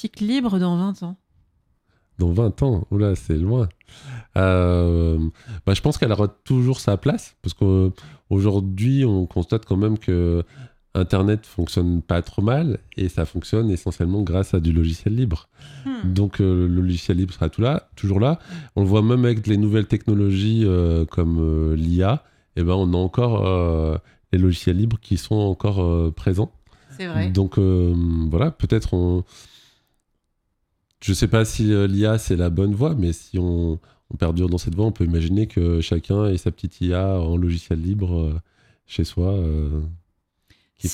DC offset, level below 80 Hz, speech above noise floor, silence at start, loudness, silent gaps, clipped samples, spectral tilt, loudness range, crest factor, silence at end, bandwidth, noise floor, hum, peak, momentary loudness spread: under 0.1%; -36 dBFS; 53 dB; 0 s; -21 LUFS; none; under 0.1%; -7.5 dB/octave; 3 LU; 18 dB; 0 s; 12.5 kHz; -72 dBFS; none; -2 dBFS; 8 LU